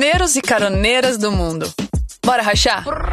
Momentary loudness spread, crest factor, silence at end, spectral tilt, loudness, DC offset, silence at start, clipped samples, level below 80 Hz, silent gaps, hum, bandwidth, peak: 9 LU; 16 dB; 0 s; -3.5 dB/octave; -16 LUFS; under 0.1%; 0 s; under 0.1%; -26 dBFS; none; none; 13.5 kHz; -2 dBFS